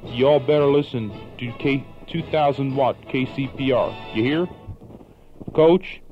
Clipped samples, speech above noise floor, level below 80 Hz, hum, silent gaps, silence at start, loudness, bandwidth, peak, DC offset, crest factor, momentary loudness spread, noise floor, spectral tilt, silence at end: under 0.1%; 24 dB; -46 dBFS; none; none; 0 s; -21 LUFS; 7.8 kHz; -4 dBFS; under 0.1%; 16 dB; 16 LU; -44 dBFS; -8.5 dB/octave; 0 s